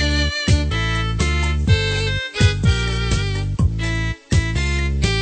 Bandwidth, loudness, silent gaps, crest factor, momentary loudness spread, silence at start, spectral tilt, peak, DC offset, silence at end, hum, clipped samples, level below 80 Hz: 9.2 kHz; -19 LUFS; none; 16 dB; 4 LU; 0 s; -5 dB/octave; -2 dBFS; under 0.1%; 0 s; none; under 0.1%; -24 dBFS